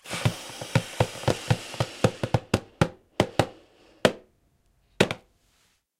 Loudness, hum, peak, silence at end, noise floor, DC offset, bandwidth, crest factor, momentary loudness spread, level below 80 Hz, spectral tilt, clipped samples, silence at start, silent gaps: -27 LUFS; none; -2 dBFS; 0.8 s; -67 dBFS; under 0.1%; 16.5 kHz; 26 dB; 5 LU; -50 dBFS; -5 dB/octave; under 0.1%; 0.05 s; none